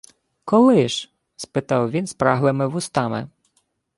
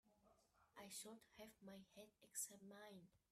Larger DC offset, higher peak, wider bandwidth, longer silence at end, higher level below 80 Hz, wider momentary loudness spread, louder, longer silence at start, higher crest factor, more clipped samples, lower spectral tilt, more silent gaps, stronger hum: neither; first, -2 dBFS vs -36 dBFS; second, 11.5 kHz vs 15.5 kHz; first, 0.7 s vs 0.15 s; first, -58 dBFS vs -90 dBFS; first, 21 LU vs 15 LU; first, -20 LUFS vs -57 LUFS; first, 0.45 s vs 0.05 s; second, 18 dB vs 24 dB; neither; first, -6 dB/octave vs -2 dB/octave; neither; neither